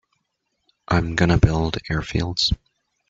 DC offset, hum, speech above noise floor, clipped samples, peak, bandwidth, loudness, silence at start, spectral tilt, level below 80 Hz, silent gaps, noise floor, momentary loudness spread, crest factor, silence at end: under 0.1%; none; 54 dB; under 0.1%; -2 dBFS; 7.8 kHz; -21 LUFS; 0.9 s; -5.5 dB/octave; -34 dBFS; none; -75 dBFS; 8 LU; 20 dB; 0.55 s